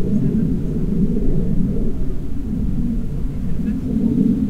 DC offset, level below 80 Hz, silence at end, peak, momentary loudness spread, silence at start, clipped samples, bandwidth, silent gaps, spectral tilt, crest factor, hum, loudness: under 0.1%; -24 dBFS; 0 s; -4 dBFS; 7 LU; 0 s; under 0.1%; 3.8 kHz; none; -10.5 dB/octave; 14 dB; none; -21 LUFS